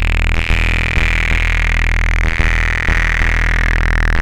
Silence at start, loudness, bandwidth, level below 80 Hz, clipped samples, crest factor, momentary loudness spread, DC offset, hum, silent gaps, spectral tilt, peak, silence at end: 0 s; -15 LUFS; 10 kHz; -16 dBFS; under 0.1%; 12 dB; 1 LU; under 0.1%; none; none; -4.5 dB/octave; 0 dBFS; 0 s